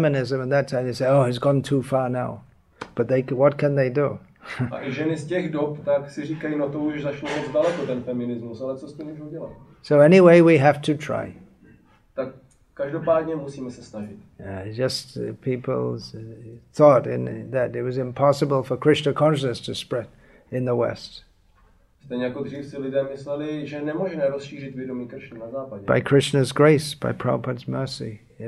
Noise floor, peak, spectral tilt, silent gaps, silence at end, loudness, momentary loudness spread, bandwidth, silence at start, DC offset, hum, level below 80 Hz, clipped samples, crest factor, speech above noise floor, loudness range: -57 dBFS; -2 dBFS; -7 dB/octave; none; 0 s; -22 LUFS; 19 LU; 12.5 kHz; 0 s; under 0.1%; none; -58 dBFS; under 0.1%; 20 dB; 35 dB; 10 LU